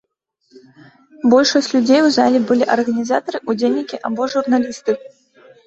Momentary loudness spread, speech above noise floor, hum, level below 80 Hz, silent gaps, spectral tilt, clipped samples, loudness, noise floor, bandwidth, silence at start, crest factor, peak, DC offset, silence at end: 9 LU; 50 dB; none; -62 dBFS; none; -4 dB/octave; under 0.1%; -16 LUFS; -66 dBFS; 8 kHz; 1.25 s; 16 dB; -2 dBFS; under 0.1%; 0.6 s